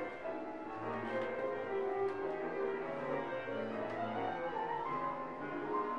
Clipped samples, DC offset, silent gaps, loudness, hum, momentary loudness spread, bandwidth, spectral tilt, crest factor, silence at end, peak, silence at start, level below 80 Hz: under 0.1%; 0.1%; none; -39 LUFS; none; 5 LU; 8 kHz; -7 dB/octave; 14 dB; 0 s; -24 dBFS; 0 s; -72 dBFS